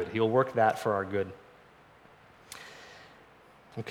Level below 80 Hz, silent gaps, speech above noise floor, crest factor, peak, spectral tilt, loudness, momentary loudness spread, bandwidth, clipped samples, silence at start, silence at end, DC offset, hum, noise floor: -72 dBFS; none; 29 dB; 20 dB; -12 dBFS; -6 dB/octave; -29 LUFS; 23 LU; 18 kHz; under 0.1%; 0 s; 0 s; under 0.1%; none; -57 dBFS